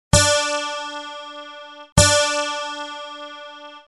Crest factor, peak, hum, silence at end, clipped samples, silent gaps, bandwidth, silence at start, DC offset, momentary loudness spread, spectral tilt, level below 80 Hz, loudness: 20 dB; 0 dBFS; none; 0.15 s; under 0.1%; 1.92-1.96 s; 12.5 kHz; 0.15 s; under 0.1%; 22 LU; -2.5 dB/octave; -36 dBFS; -19 LUFS